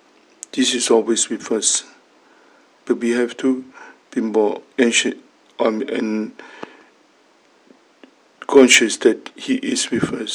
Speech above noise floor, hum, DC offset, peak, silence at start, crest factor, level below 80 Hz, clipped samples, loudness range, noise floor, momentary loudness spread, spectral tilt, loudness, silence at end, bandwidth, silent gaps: 37 dB; none; under 0.1%; 0 dBFS; 0.55 s; 20 dB; -66 dBFS; under 0.1%; 5 LU; -55 dBFS; 18 LU; -2 dB/octave; -18 LUFS; 0 s; 17.5 kHz; none